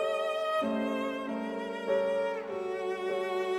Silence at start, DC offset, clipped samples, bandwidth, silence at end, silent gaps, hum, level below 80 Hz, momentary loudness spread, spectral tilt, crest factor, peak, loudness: 0 s; under 0.1%; under 0.1%; 15 kHz; 0 s; none; none; -72 dBFS; 6 LU; -5 dB/octave; 14 dB; -18 dBFS; -32 LUFS